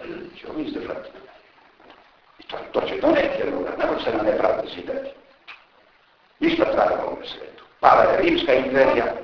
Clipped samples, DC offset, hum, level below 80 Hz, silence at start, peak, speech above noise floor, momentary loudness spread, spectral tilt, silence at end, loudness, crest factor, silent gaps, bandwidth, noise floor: under 0.1%; under 0.1%; none; -50 dBFS; 0 s; 0 dBFS; 37 dB; 19 LU; -6 dB/octave; 0 s; -21 LUFS; 22 dB; none; 5.4 kHz; -58 dBFS